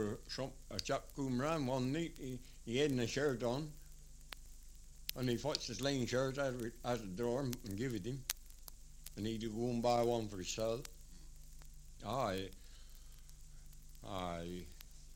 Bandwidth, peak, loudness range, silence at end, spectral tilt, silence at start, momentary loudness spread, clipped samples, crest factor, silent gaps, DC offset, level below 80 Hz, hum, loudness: 16.5 kHz; -14 dBFS; 7 LU; 0 s; -5 dB/octave; 0 s; 23 LU; under 0.1%; 28 dB; none; under 0.1%; -54 dBFS; none; -40 LUFS